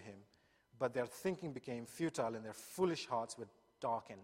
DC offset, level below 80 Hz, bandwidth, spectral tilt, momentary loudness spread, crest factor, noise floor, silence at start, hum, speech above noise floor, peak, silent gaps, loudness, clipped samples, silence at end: under 0.1%; -78 dBFS; 16 kHz; -5 dB/octave; 12 LU; 20 dB; -73 dBFS; 0 s; none; 32 dB; -22 dBFS; none; -42 LUFS; under 0.1%; 0 s